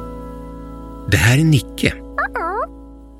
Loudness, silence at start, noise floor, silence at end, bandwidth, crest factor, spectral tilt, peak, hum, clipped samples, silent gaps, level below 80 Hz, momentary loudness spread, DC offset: -17 LUFS; 0 s; -38 dBFS; 0 s; 16 kHz; 18 dB; -5.5 dB/octave; 0 dBFS; none; under 0.1%; none; -34 dBFS; 20 LU; under 0.1%